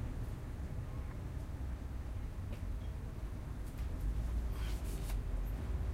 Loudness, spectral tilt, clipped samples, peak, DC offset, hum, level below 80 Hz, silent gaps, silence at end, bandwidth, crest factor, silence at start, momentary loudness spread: -43 LUFS; -6.5 dB/octave; under 0.1%; -28 dBFS; under 0.1%; none; -40 dBFS; none; 0 s; 16 kHz; 12 dB; 0 s; 5 LU